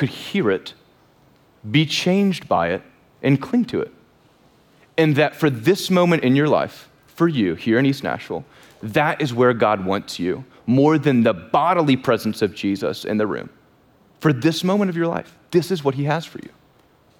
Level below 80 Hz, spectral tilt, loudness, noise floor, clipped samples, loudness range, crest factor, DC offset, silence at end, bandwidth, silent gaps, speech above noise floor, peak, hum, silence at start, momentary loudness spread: -62 dBFS; -6.5 dB/octave; -20 LUFS; -56 dBFS; under 0.1%; 4 LU; 16 dB; under 0.1%; 0.7 s; 18.5 kHz; none; 36 dB; -6 dBFS; none; 0 s; 11 LU